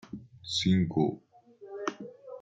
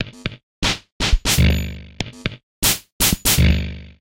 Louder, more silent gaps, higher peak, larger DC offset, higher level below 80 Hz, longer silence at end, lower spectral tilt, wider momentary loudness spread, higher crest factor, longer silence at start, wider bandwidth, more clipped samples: second, -30 LUFS vs -19 LUFS; second, none vs 0.43-0.62 s, 0.92-1.00 s, 2.43-2.62 s, 2.92-3.00 s; second, -14 dBFS vs -2 dBFS; neither; second, -64 dBFS vs -24 dBFS; about the same, 0 s vs 0.1 s; first, -5.5 dB/octave vs -3 dB/octave; first, 20 LU vs 15 LU; about the same, 18 dB vs 18 dB; about the same, 0.05 s vs 0 s; second, 9 kHz vs 17 kHz; neither